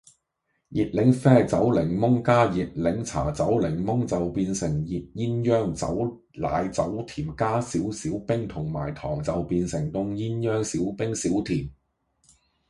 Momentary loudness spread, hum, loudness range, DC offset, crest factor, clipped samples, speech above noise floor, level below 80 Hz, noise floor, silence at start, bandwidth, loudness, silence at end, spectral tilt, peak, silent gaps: 10 LU; none; 6 LU; under 0.1%; 22 dB; under 0.1%; 52 dB; -46 dBFS; -76 dBFS; 0.7 s; 11.5 kHz; -25 LUFS; 0.95 s; -7 dB/octave; -4 dBFS; none